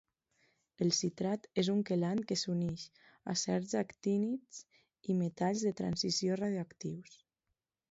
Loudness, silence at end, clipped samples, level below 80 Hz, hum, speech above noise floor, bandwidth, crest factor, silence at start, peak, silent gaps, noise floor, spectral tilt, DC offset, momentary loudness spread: -35 LUFS; 0.75 s; under 0.1%; -70 dBFS; none; 52 dB; 8 kHz; 18 dB; 0.8 s; -18 dBFS; none; -87 dBFS; -5.5 dB/octave; under 0.1%; 13 LU